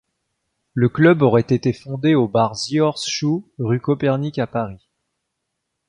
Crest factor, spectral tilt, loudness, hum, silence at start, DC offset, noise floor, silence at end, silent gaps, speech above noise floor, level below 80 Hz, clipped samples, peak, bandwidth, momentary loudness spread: 18 dB; -6.5 dB/octave; -19 LUFS; none; 0.75 s; under 0.1%; -77 dBFS; 1.15 s; none; 59 dB; -54 dBFS; under 0.1%; -2 dBFS; 10.5 kHz; 9 LU